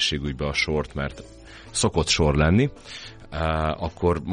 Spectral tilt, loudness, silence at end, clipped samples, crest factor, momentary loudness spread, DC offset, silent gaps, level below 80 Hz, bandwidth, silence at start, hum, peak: -4.5 dB/octave; -23 LUFS; 0 s; under 0.1%; 18 dB; 19 LU; under 0.1%; none; -36 dBFS; 10.5 kHz; 0 s; none; -6 dBFS